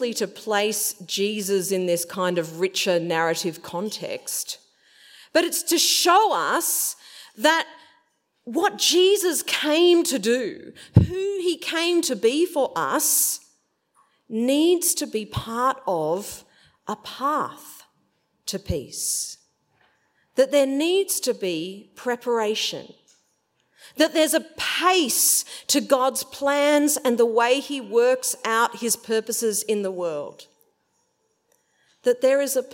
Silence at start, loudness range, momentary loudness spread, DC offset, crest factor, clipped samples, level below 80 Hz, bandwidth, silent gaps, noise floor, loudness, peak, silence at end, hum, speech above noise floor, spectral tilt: 0 s; 7 LU; 13 LU; under 0.1%; 22 dB; under 0.1%; -52 dBFS; 16.5 kHz; none; -70 dBFS; -22 LUFS; -2 dBFS; 0 s; none; 48 dB; -3 dB/octave